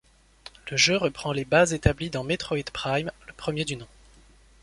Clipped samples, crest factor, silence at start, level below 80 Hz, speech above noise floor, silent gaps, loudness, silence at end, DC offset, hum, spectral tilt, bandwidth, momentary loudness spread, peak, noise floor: under 0.1%; 24 dB; 0.65 s; -44 dBFS; 29 dB; none; -25 LUFS; 0.8 s; under 0.1%; none; -4 dB/octave; 11.5 kHz; 13 LU; -4 dBFS; -55 dBFS